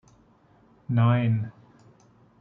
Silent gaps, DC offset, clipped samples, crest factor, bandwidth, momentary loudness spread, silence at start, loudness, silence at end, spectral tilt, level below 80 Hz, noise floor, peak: none; under 0.1%; under 0.1%; 18 dB; 3.9 kHz; 18 LU; 0.9 s; -24 LUFS; 0.9 s; -10 dB/octave; -66 dBFS; -59 dBFS; -10 dBFS